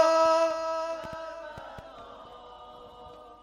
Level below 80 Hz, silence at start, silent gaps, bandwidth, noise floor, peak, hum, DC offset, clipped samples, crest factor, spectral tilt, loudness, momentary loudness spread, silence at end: -62 dBFS; 0 s; none; 11 kHz; -48 dBFS; -12 dBFS; none; under 0.1%; under 0.1%; 18 dB; -3.5 dB/octave; -27 LUFS; 25 LU; 0.1 s